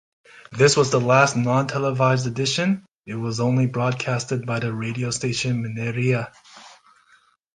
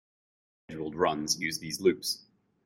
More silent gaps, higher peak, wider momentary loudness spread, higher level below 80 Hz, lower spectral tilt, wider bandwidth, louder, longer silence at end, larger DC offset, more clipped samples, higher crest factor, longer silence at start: first, 2.95-2.99 s vs none; first, -2 dBFS vs -12 dBFS; about the same, 10 LU vs 11 LU; first, -58 dBFS vs -66 dBFS; first, -5 dB/octave vs -3 dB/octave; second, 9.8 kHz vs 16 kHz; first, -21 LUFS vs -30 LUFS; first, 0.85 s vs 0.5 s; neither; neither; about the same, 20 dB vs 20 dB; second, 0.35 s vs 0.7 s